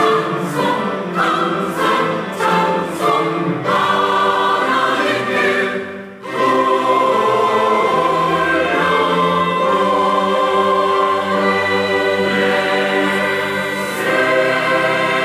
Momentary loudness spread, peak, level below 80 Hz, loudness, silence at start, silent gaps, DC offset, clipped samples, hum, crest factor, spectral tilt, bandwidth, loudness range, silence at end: 4 LU; -4 dBFS; -60 dBFS; -15 LUFS; 0 s; none; under 0.1%; under 0.1%; none; 12 dB; -4.5 dB/octave; 16 kHz; 2 LU; 0 s